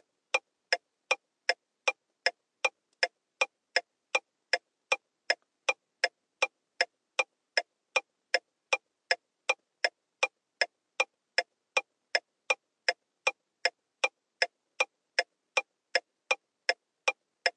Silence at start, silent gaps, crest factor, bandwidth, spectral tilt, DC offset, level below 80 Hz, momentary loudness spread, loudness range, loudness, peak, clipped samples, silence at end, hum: 0.35 s; none; 24 dB; 11 kHz; 3 dB/octave; under 0.1%; under -90 dBFS; 2 LU; 0 LU; -32 LUFS; -10 dBFS; under 0.1%; 0.05 s; none